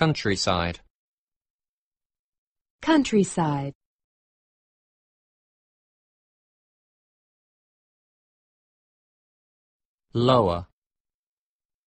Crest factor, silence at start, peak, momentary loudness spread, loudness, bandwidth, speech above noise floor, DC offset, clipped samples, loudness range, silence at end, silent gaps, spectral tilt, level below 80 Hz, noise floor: 22 dB; 0 s; -6 dBFS; 13 LU; -24 LUFS; 8.4 kHz; over 68 dB; under 0.1%; under 0.1%; 6 LU; 1.25 s; 0.90-1.28 s, 1.36-1.40 s, 1.50-1.59 s, 1.68-1.92 s, 2.05-2.10 s, 2.19-2.55 s, 2.61-2.79 s, 3.75-9.98 s; -5.5 dB/octave; -54 dBFS; under -90 dBFS